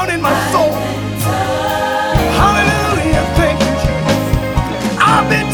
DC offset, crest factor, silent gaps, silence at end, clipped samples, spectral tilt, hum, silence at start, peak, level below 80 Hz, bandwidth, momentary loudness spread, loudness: under 0.1%; 12 dB; none; 0 s; under 0.1%; -5 dB/octave; none; 0 s; 0 dBFS; -24 dBFS; over 20 kHz; 6 LU; -14 LUFS